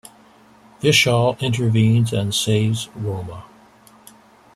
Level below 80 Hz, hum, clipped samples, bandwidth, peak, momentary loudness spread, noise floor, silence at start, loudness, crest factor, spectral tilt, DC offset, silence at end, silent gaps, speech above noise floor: -52 dBFS; none; under 0.1%; 14 kHz; -4 dBFS; 13 LU; -50 dBFS; 0.8 s; -18 LUFS; 18 dB; -5 dB/octave; under 0.1%; 1.15 s; none; 32 dB